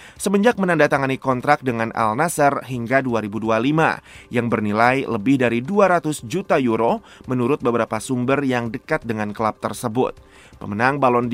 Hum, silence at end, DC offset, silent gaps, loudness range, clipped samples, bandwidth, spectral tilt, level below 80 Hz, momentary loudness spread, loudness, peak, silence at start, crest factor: none; 0 s; under 0.1%; none; 3 LU; under 0.1%; 16 kHz; -6 dB/octave; -52 dBFS; 8 LU; -20 LUFS; 0 dBFS; 0 s; 20 dB